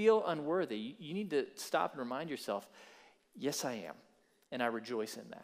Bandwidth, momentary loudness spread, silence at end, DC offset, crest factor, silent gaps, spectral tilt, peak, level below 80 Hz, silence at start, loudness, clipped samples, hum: 15.5 kHz; 13 LU; 0 s; under 0.1%; 20 dB; none; -4 dB/octave; -16 dBFS; -90 dBFS; 0 s; -38 LUFS; under 0.1%; none